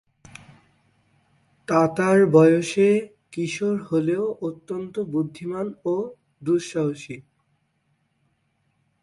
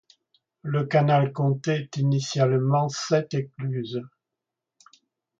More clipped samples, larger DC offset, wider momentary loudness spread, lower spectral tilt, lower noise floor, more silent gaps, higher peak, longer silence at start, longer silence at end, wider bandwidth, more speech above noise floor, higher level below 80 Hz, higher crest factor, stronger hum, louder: neither; neither; first, 18 LU vs 10 LU; about the same, -6.5 dB/octave vs -6.5 dB/octave; second, -70 dBFS vs -86 dBFS; neither; first, -4 dBFS vs -8 dBFS; first, 1.7 s vs 0.65 s; first, 1.8 s vs 1.3 s; first, 11.5 kHz vs 7.6 kHz; second, 48 dB vs 62 dB; about the same, -66 dBFS vs -68 dBFS; about the same, 20 dB vs 18 dB; neither; about the same, -22 LUFS vs -24 LUFS